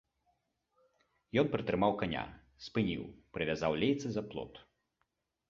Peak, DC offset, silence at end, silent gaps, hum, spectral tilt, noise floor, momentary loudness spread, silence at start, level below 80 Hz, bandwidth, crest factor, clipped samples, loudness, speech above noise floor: -16 dBFS; under 0.1%; 0.9 s; none; none; -5 dB/octave; -83 dBFS; 14 LU; 1.35 s; -60 dBFS; 7.6 kHz; 22 dB; under 0.1%; -35 LUFS; 48 dB